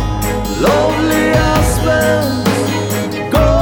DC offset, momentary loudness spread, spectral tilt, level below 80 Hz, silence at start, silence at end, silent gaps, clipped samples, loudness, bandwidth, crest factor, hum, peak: under 0.1%; 6 LU; -5.5 dB/octave; -22 dBFS; 0 s; 0 s; none; under 0.1%; -14 LUFS; over 20 kHz; 12 dB; none; 0 dBFS